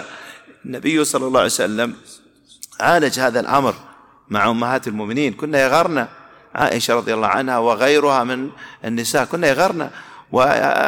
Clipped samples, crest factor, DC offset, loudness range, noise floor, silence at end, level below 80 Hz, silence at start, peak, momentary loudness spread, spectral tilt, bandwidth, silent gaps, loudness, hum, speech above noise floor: under 0.1%; 16 dB; under 0.1%; 2 LU; -42 dBFS; 0 s; -56 dBFS; 0 s; -2 dBFS; 16 LU; -4 dB/octave; 19 kHz; none; -18 LUFS; none; 25 dB